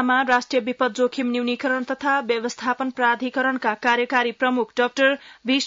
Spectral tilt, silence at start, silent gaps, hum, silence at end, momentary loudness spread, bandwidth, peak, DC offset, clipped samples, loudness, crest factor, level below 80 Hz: -3 dB/octave; 0 s; none; none; 0 s; 5 LU; 7.8 kHz; -6 dBFS; under 0.1%; under 0.1%; -22 LUFS; 16 dB; -70 dBFS